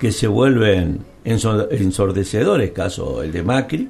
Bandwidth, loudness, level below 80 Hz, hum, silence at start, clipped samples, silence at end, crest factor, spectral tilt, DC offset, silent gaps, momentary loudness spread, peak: 13 kHz; -18 LUFS; -36 dBFS; none; 0 s; under 0.1%; 0 s; 16 dB; -6 dB/octave; under 0.1%; none; 9 LU; -2 dBFS